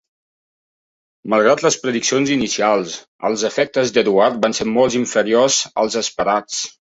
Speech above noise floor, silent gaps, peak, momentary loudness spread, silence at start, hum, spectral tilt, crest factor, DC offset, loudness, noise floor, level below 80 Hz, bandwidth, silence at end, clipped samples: over 73 dB; 3.08-3.19 s; -2 dBFS; 7 LU; 1.25 s; none; -3 dB/octave; 16 dB; under 0.1%; -17 LUFS; under -90 dBFS; -58 dBFS; 8.2 kHz; 0.25 s; under 0.1%